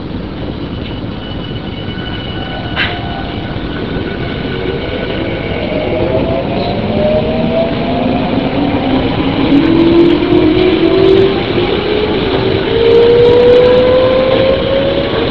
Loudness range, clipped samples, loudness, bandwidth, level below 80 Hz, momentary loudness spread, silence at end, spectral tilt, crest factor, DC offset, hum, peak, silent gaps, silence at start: 10 LU; 0.2%; -12 LUFS; 6 kHz; -28 dBFS; 14 LU; 0 s; -8.5 dB/octave; 12 dB; 2%; none; 0 dBFS; none; 0 s